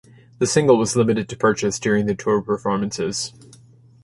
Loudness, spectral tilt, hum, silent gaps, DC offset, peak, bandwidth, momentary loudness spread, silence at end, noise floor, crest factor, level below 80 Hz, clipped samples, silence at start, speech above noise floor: -20 LUFS; -5 dB/octave; none; none; under 0.1%; -2 dBFS; 11.5 kHz; 8 LU; 0.75 s; -49 dBFS; 18 dB; -54 dBFS; under 0.1%; 0.4 s; 29 dB